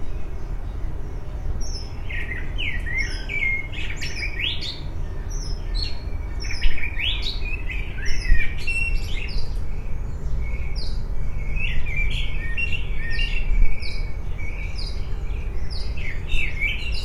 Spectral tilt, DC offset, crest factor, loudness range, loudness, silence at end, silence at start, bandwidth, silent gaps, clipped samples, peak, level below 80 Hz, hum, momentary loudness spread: -4 dB/octave; under 0.1%; 16 dB; 3 LU; -28 LUFS; 0 s; 0 s; 8.6 kHz; none; under 0.1%; -4 dBFS; -24 dBFS; none; 9 LU